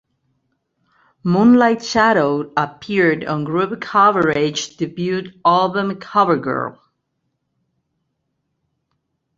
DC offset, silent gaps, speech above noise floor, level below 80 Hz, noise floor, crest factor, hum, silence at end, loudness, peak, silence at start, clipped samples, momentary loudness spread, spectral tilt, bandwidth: under 0.1%; none; 56 dB; -58 dBFS; -73 dBFS; 18 dB; none; 2.65 s; -17 LUFS; 0 dBFS; 1.25 s; under 0.1%; 10 LU; -5.5 dB/octave; 7.6 kHz